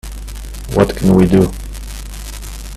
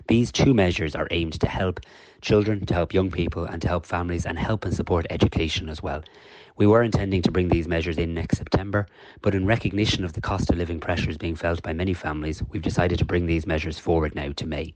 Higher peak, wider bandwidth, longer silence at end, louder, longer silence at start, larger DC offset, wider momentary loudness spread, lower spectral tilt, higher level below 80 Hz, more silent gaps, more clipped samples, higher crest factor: first, 0 dBFS vs -6 dBFS; first, 14.5 kHz vs 9.2 kHz; about the same, 0 s vs 0.05 s; first, -13 LUFS vs -24 LUFS; about the same, 0.05 s vs 0 s; neither; first, 19 LU vs 9 LU; about the same, -7 dB/octave vs -6.5 dB/octave; first, -26 dBFS vs -36 dBFS; neither; neither; about the same, 16 dB vs 18 dB